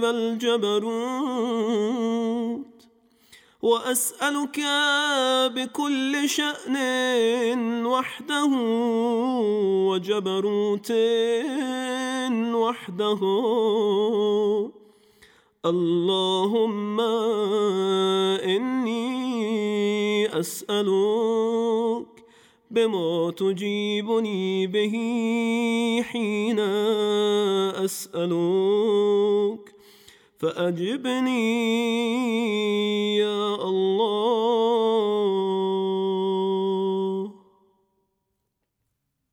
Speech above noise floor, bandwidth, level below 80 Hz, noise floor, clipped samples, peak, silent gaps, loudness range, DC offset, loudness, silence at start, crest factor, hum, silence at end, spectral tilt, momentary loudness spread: 55 dB; 18.5 kHz; -78 dBFS; -78 dBFS; under 0.1%; -10 dBFS; none; 3 LU; under 0.1%; -24 LUFS; 0 s; 14 dB; none; 2 s; -4.5 dB/octave; 5 LU